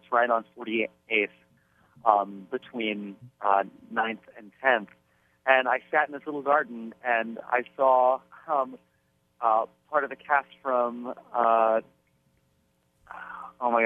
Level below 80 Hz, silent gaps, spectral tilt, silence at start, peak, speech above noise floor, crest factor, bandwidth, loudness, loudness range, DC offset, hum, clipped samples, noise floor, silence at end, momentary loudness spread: -78 dBFS; none; -6.5 dB/octave; 0.1 s; -4 dBFS; 44 dB; 24 dB; 3.8 kHz; -27 LUFS; 3 LU; under 0.1%; none; under 0.1%; -70 dBFS; 0 s; 13 LU